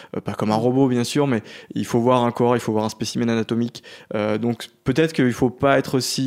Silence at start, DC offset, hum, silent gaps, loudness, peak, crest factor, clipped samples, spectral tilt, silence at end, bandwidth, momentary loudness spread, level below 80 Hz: 0 s; under 0.1%; none; none; -21 LUFS; -2 dBFS; 18 dB; under 0.1%; -5.5 dB/octave; 0 s; 16 kHz; 9 LU; -54 dBFS